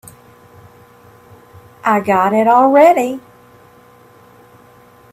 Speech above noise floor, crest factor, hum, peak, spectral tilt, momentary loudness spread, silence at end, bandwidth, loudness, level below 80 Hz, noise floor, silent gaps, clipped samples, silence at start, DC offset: 34 dB; 16 dB; 60 Hz at -50 dBFS; 0 dBFS; -6 dB/octave; 13 LU; 1.95 s; 15.5 kHz; -12 LUFS; -60 dBFS; -45 dBFS; none; under 0.1%; 1.85 s; under 0.1%